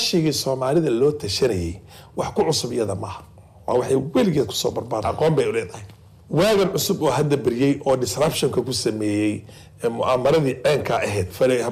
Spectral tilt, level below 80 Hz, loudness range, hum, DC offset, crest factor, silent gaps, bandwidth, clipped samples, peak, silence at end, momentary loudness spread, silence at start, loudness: -5 dB/octave; -50 dBFS; 2 LU; none; under 0.1%; 12 dB; none; 16 kHz; under 0.1%; -8 dBFS; 0 s; 9 LU; 0 s; -21 LUFS